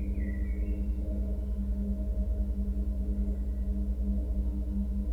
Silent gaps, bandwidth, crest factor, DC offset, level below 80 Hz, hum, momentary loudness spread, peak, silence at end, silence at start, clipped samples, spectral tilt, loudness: none; 2.6 kHz; 10 dB; 0.4%; -30 dBFS; 50 Hz at -35 dBFS; 2 LU; -20 dBFS; 0 s; 0 s; under 0.1%; -10 dB/octave; -34 LUFS